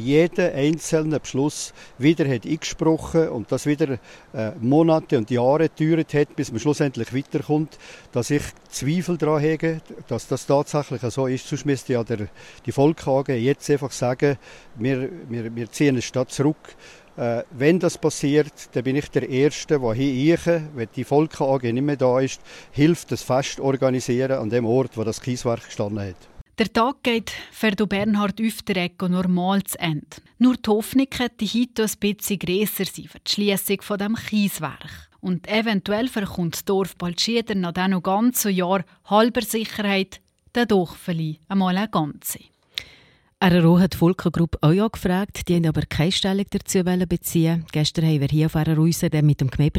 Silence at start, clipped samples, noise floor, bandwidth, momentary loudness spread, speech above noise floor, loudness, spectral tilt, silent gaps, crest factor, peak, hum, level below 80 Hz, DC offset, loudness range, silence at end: 0 s; under 0.1%; -54 dBFS; 16.5 kHz; 10 LU; 33 dB; -22 LUFS; -5.5 dB/octave; 26.41-26.46 s; 18 dB; -4 dBFS; none; -48 dBFS; under 0.1%; 3 LU; 0 s